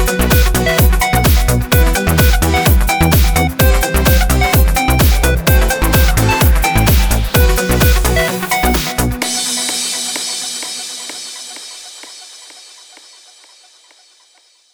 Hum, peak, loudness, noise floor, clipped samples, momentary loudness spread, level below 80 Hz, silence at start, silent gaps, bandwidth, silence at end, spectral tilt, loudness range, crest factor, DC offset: none; 0 dBFS; -13 LUFS; -51 dBFS; under 0.1%; 13 LU; -16 dBFS; 0 s; none; over 20 kHz; 2.15 s; -4 dB/octave; 13 LU; 12 dB; under 0.1%